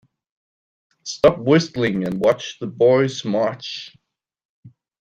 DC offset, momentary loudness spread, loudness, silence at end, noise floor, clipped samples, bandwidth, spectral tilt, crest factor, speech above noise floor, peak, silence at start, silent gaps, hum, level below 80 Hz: under 0.1%; 16 LU; -19 LUFS; 0.3 s; under -90 dBFS; under 0.1%; 9 kHz; -5.5 dB/octave; 20 dB; over 71 dB; -2 dBFS; 1.05 s; 4.45-4.63 s; none; -54 dBFS